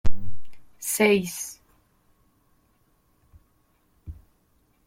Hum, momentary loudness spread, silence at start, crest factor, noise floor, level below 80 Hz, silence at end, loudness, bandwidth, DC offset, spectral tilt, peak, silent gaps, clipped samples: none; 28 LU; 0.05 s; 18 dB; -65 dBFS; -42 dBFS; 0.75 s; -25 LUFS; 16.5 kHz; under 0.1%; -4 dB/octave; -6 dBFS; none; under 0.1%